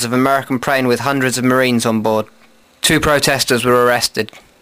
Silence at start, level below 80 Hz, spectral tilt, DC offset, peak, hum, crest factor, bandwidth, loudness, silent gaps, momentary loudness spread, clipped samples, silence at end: 0 s; -42 dBFS; -4 dB/octave; under 0.1%; 0 dBFS; none; 14 dB; 16 kHz; -14 LUFS; none; 6 LU; under 0.1%; 0.2 s